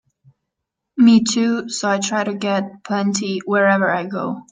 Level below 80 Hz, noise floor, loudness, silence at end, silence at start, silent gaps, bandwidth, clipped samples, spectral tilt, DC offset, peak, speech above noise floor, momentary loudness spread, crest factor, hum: -64 dBFS; -80 dBFS; -18 LUFS; 0.1 s; 0.95 s; none; 9.4 kHz; under 0.1%; -4.5 dB/octave; under 0.1%; -4 dBFS; 62 dB; 11 LU; 16 dB; none